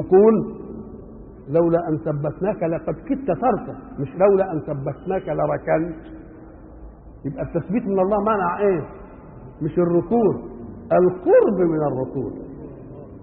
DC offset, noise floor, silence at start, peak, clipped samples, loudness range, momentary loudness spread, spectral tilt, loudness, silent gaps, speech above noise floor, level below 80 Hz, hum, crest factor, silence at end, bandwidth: under 0.1%; -41 dBFS; 0 s; -4 dBFS; under 0.1%; 4 LU; 21 LU; -13.5 dB/octave; -21 LUFS; none; 21 dB; -46 dBFS; none; 16 dB; 0 s; 3.3 kHz